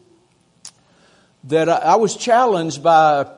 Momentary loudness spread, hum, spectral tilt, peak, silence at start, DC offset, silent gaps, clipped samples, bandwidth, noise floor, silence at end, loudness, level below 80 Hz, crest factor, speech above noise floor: 5 LU; none; -4.5 dB/octave; -2 dBFS; 0.65 s; under 0.1%; none; under 0.1%; 11 kHz; -57 dBFS; 0.05 s; -15 LUFS; -68 dBFS; 16 dB; 42 dB